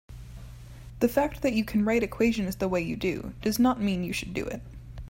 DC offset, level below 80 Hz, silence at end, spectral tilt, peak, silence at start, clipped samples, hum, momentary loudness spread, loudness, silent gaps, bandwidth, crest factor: under 0.1%; -46 dBFS; 0 s; -5.5 dB/octave; -10 dBFS; 0.1 s; under 0.1%; none; 21 LU; -27 LUFS; none; 16.5 kHz; 18 dB